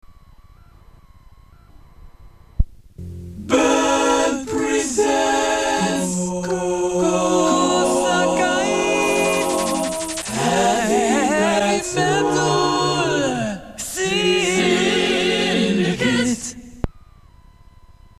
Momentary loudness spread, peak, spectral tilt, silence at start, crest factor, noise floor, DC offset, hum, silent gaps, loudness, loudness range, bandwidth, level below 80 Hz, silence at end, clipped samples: 11 LU; -2 dBFS; -3.5 dB/octave; 0.1 s; 18 dB; -47 dBFS; under 0.1%; none; none; -19 LUFS; 4 LU; 15 kHz; -38 dBFS; 1.2 s; under 0.1%